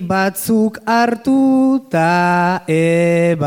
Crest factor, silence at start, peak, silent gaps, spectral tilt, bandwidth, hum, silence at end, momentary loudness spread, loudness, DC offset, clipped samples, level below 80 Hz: 12 dB; 0 s; -2 dBFS; none; -6.5 dB/octave; 17.5 kHz; none; 0 s; 3 LU; -14 LUFS; under 0.1%; under 0.1%; -56 dBFS